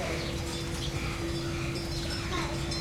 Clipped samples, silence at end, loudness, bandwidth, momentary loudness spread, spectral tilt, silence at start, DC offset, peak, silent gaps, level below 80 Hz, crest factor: under 0.1%; 0 s; -33 LUFS; 16.5 kHz; 1 LU; -4.5 dB/octave; 0 s; under 0.1%; -18 dBFS; none; -40 dBFS; 14 dB